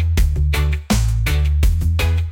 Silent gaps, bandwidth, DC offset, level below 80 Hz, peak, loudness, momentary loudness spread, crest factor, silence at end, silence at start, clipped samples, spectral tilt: none; 17 kHz; under 0.1%; -18 dBFS; -6 dBFS; -18 LUFS; 1 LU; 10 dB; 0 s; 0 s; under 0.1%; -5.5 dB/octave